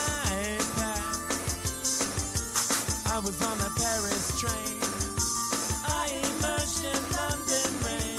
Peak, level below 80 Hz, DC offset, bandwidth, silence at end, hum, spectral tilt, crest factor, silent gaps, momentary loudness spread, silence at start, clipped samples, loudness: -12 dBFS; -42 dBFS; under 0.1%; 16 kHz; 0 s; none; -2.5 dB/octave; 18 dB; none; 3 LU; 0 s; under 0.1%; -28 LUFS